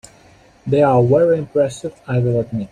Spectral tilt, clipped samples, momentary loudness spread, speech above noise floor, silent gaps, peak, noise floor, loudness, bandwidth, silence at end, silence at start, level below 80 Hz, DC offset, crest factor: -8 dB/octave; under 0.1%; 9 LU; 33 dB; none; -2 dBFS; -48 dBFS; -16 LUFS; 10.5 kHz; 0.05 s; 0.65 s; -50 dBFS; under 0.1%; 14 dB